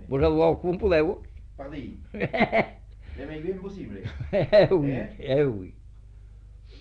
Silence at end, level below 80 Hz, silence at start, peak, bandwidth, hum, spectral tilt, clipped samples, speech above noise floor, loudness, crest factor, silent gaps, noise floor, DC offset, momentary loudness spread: 0 s; -42 dBFS; 0 s; -6 dBFS; 6.8 kHz; 50 Hz at -45 dBFS; -8.5 dB/octave; under 0.1%; 22 dB; -24 LUFS; 20 dB; none; -46 dBFS; under 0.1%; 19 LU